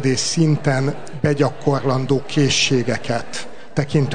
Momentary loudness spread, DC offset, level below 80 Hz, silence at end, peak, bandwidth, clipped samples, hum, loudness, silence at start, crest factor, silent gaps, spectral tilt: 9 LU; 3%; -52 dBFS; 0 s; -4 dBFS; 9.6 kHz; under 0.1%; none; -19 LUFS; 0 s; 16 dB; none; -5 dB/octave